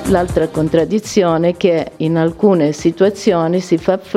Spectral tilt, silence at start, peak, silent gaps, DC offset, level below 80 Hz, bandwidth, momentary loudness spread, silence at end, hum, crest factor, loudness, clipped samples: -6.5 dB/octave; 0 s; 0 dBFS; none; under 0.1%; -38 dBFS; 14 kHz; 3 LU; 0 s; none; 14 dB; -15 LUFS; under 0.1%